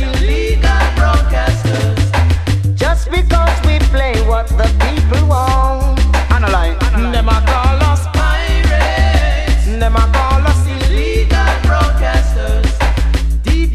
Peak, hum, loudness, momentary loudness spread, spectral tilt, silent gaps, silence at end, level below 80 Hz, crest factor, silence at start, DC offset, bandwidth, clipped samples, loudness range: 0 dBFS; none; -13 LUFS; 3 LU; -6 dB/octave; none; 0 s; -12 dBFS; 12 dB; 0 s; under 0.1%; 13.5 kHz; under 0.1%; 1 LU